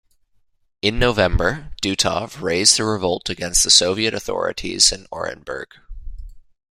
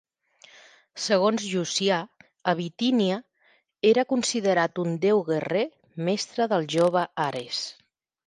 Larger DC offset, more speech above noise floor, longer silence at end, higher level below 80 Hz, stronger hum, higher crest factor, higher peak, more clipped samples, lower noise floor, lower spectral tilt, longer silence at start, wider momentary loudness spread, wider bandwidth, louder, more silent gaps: neither; about the same, 42 dB vs 40 dB; second, 0.35 s vs 0.55 s; first, -34 dBFS vs -74 dBFS; neither; about the same, 20 dB vs 18 dB; first, 0 dBFS vs -8 dBFS; neither; second, -61 dBFS vs -65 dBFS; second, -2 dB/octave vs -4.5 dB/octave; about the same, 0.85 s vs 0.95 s; first, 16 LU vs 9 LU; first, 16 kHz vs 11.5 kHz; first, -18 LUFS vs -25 LUFS; neither